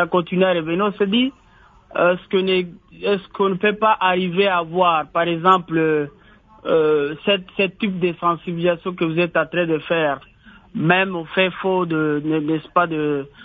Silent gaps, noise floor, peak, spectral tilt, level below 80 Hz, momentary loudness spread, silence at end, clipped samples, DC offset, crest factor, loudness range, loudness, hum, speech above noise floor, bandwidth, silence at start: none; -50 dBFS; 0 dBFS; -8.5 dB/octave; -56 dBFS; 6 LU; 0 s; under 0.1%; under 0.1%; 20 dB; 3 LU; -19 LUFS; none; 31 dB; 7.2 kHz; 0 s